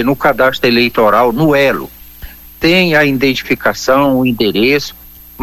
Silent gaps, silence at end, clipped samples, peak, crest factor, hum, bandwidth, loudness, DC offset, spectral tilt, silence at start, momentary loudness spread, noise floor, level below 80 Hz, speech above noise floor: none; 0 s; under 0.1%; 0 dBFS; 12 dB; none; 18 kHz; -11 LUFS; under 0.1%; -5 dB/octave; 0 s; 5 LU; -33 dBFS; -38 dBFS; 21 dB